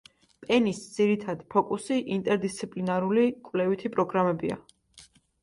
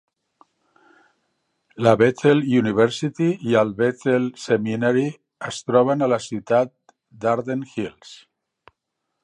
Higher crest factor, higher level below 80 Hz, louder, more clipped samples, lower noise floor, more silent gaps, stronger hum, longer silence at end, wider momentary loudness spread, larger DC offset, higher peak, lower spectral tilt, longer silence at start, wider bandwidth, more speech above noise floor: about the same, 18 dB vs 20 dB; about the same, -66 dBFS vs -62 dBFS; second, -27 LUFS vs -21 LUFS; neither; second, -56 dBFS vs -79 dBFS; neither; neither; second, 0.4 s vs 1.1 s; second, 7 LU vs 12 LU; neither; second, -10 dBFS vs 0 dBFS; about the same, -6 dB/octave vs -6.5 dB/octave; second, 0.4 s vs 1.75 s; about the same, 11.5 kHz vs 10.5 kHz; second, 30 dB vs 59 dB